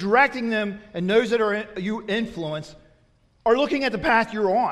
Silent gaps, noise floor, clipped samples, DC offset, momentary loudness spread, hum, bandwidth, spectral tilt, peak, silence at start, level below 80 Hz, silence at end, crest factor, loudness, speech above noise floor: none; -60 dBFS; under 0.1%; under 0.1%; 10 LU; none; 11.5 kHz; -5.5 dB/octave; -6 dBFS; 0 s; -54 dBFS; 0 s; 18 dB; -23 LUFS; 38 dB